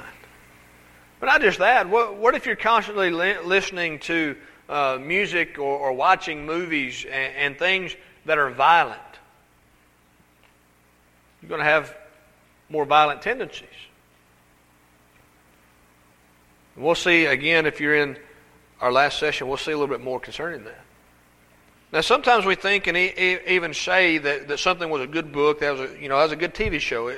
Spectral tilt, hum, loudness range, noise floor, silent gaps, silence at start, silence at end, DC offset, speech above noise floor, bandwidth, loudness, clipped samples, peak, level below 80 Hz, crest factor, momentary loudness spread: -3.5 dB/octave; 60 Hz at -65 dBFS; 6 LU; -58 dBFS; none; 0 s; 0 s; under 0.1%; 37 dB; 16 kHz; -21 LUFS; under 0.1%; -2 dBFS; -52 dBFS; 22 dB; 11 LU